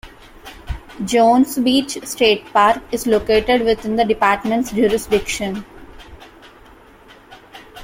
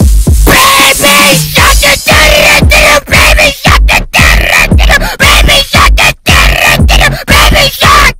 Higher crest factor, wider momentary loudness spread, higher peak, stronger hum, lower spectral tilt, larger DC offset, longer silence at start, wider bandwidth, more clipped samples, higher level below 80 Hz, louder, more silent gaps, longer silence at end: first, 16 dB vs 4 dB; first, 16 LU vs 3 LU; about the same, -2 dBFS vs 0 dBFS; neither; about the same, -4 dB/octave vs -3 dB/octave; second, under 0.1% vs 0.7%; about the same, 0.05 s vs 0 s; second, 16.5 kHz vs 19.5 kHz; second, under 0.1% vs 7%; second, -40 dBFS vs -10 dBFS; second, -17 LUFS vs -3 LUFS; neither; about the same, 0 s vs 0 s